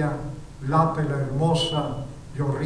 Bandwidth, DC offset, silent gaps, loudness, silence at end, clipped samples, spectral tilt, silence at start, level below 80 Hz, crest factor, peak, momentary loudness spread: 11 kHz; under 0.1%; none; -25 LUFS; 0 s; under 0.1%; -6.5 dB/octave; 0 s; -44 dBFS; 18 dB; -8 dBFS; 13 LU